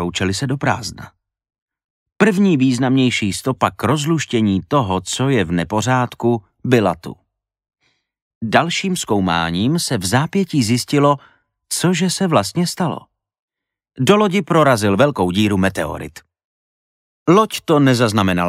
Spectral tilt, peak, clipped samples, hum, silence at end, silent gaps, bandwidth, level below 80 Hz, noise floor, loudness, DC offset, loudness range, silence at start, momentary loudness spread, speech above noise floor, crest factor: -5 dB/octave; 0 dBFS; under 0.1%; none; 0 s; 1.62-1.68 s, 1.84-2.06 s, 8.22-8.41 s, 13.39-13.48 s, 16.45-17.26 s; 16 kHz; -50 dBFS; under -90 dBFS; -17 LUFS; under 0.1%; 3 LU; 0 s; 9 LU; over 74 dB; 18 dB